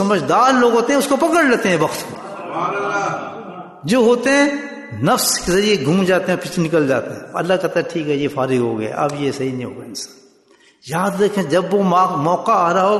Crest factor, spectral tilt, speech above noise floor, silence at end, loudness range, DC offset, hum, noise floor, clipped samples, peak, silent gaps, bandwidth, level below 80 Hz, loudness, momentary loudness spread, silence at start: 14 dB; -4.5 dB/octave; 36 dB; 0 s; 5 LU; under 0.1%; none; -52 dBFS; under 0.1%; -4 dBFS; none; 12.5 kHz; -52 dBFS; -17 LUFS; 14 LU; 0 s